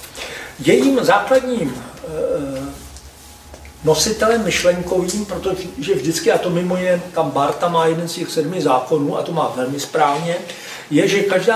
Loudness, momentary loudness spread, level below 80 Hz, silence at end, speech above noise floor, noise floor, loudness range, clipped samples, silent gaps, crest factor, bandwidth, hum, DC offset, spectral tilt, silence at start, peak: -18 LUFS; 14 LU; -46 dBFS; 0 s; 23 dB; -40 dBFS; 2 LU; under 0.1%; none; 18 dB; 16 kHz; none; under 0.1%; -4.5 dB/octave; 0 s; 0 dBFS